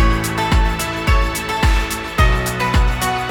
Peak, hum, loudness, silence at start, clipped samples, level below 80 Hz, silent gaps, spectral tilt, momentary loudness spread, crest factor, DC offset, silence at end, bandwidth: -2 dBFS; none; -17 LUFS; 0 s; under 0.1%; -18 dBFS; none; -4.5 dB/octave; 3 LU; 14 dB; under 0.1%; 0 s; 18 kHz